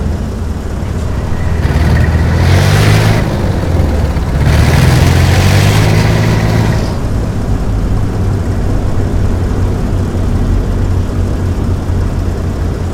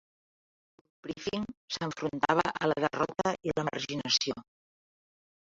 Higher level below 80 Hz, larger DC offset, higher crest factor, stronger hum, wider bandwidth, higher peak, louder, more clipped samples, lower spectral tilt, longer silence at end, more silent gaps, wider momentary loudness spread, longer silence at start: first, -16 dBFS vs -64 dBFS; neither; second, 10 dB vs 24 dB; neither; first, 17 kHz vs 7.8 kHz; first, 0 dBFS vs -10 dBFS; first, -12 LUFS vs -31 LUFS; first, 0.1% vs under 0.1%; first, -6.5 dB/octave vs -4 dB/octave; second, 0 s vs 1 s; second, none vs 1.57-1.68 s; about the same, 8 LU vs 10 LU; second, 0 s vs 1.05 s